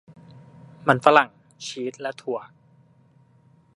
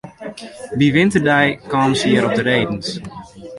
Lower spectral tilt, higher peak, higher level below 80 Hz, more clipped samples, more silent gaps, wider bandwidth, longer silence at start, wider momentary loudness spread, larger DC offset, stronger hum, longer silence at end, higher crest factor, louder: about the same, -5 dB/octave vs -5.5 dB/octave; about the same, 0 dBFS vs -2 dBFS; second, -72 dBFS vs -48 dBFS; neither; neither; about the same, 11.5 kHz vs 11.5 kHz; first, 0.85 s vs 0.05 s; about the same, 17 LU vs 19 LU; neither; neither; first, 1.35 s vs 0 s; first, 26 dB vs 16 dB; second, -22 LUFS vs -16 LUFS